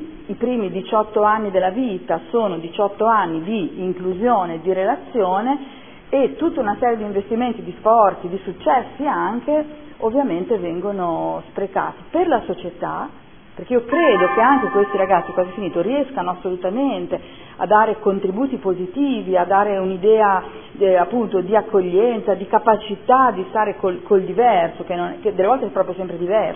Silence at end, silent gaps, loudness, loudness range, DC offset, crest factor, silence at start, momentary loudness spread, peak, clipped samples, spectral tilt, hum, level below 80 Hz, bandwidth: 0 s; none; -19 LUFS; 4 LU; 0.5%; 18 dB; 0 s; 10 LU; 0 dBFS; under 0.1%; -10.5 dB/octave; none; -52 dBFS; 3.6 kHz